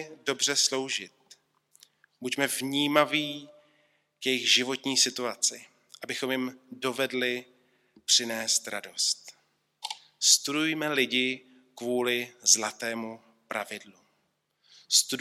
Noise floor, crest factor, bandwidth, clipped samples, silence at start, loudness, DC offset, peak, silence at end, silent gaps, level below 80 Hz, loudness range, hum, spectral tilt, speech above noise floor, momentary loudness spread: -75 dBFS; 24 dB; 16.5 kHz; under 0.1%; 0 s; -26 LUFS; under 0.1%; -6 dBFS; 0 s; none; -86 dBFS; 4 LU; none; -1 dB/octave; 47 dB; 16 LU